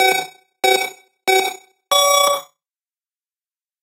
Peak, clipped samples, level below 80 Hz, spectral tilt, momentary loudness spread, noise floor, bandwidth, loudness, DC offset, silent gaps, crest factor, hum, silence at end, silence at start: 0 dBFS; under 0.1%; -76 dBFS; 0.5 dB/octave; 11 LU; under -90 dBFS; 16 kHz; -17 LUFS; under 0.1%; none; 20 dB; none; 1.4 s; 0 s